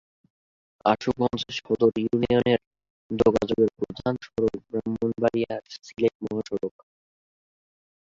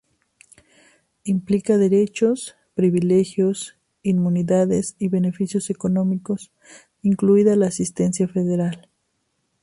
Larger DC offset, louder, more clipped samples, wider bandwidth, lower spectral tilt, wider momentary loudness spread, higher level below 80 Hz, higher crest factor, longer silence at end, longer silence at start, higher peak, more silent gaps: neither; second, -26 LUFS vs -20 LUFS; neither; second, 7.6 kHz vs 11.5 kHz; about the same, -6.5 dB/octave vs -7 dB/octave; about the same, 9 LU vs 11 LU; about the same, -54 dBFS vs -58 dBFS; about the same, 20 dB vs 16 dB; first, 1.5 s vs 0.85 s; second, 0.85 s vs 1.25 s; about the same, -6 dBFS vs -4 dBFS; first, 2.67-2.71 s, 2.90-3.10 s, 6.15-6.20 s vs none